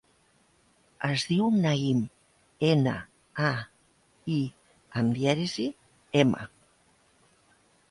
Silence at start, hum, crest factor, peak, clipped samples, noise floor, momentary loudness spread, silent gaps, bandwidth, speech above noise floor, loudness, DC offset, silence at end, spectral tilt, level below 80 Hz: 1 s; none; 22 dB; -8 dBFS; under 0.1%; -65 dBFS; 14 LU; none; 11.5 kHz; 40 dB; -28 LUFS; under 0.1%; 1.45 s; -6 dB/octave; -64 dBFS